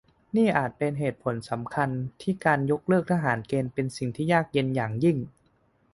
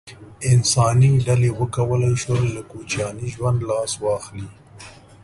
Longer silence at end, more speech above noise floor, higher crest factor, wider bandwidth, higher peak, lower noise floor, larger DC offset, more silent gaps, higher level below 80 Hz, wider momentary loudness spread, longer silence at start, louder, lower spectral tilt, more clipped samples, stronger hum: first, 0.65 s vs 0.35 s; first, 40 dB vs 23 dB; about the same, 20 dB vs 16 dB; about the same, 11.5 kHz vs 11.5 kHz; about the same, -6 dBFS vs -4 dBFS; first, -66 dBFS vs -43 dBFS; neither; neither; second, -60 dBFS vs -44 dBFS; second, 8 LU vs 12 LU; first, 0.35 s vs 0.05 s; second, -27 LUFS vs -20 LUFS; first, -7.5 dB/octave vs -5.5 dB/octave; neither; neither